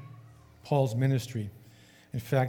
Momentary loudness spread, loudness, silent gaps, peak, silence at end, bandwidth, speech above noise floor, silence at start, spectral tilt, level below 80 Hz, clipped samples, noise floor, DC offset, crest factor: 19 LU; -30 LUFS; none; -12 dBFS; 0 s; 17.5 kHz; 28 dB; 0 s; -7 dB/octave; -66 dBFS; under 0.1%; -56 dBFS; under 0.1%; 18 dB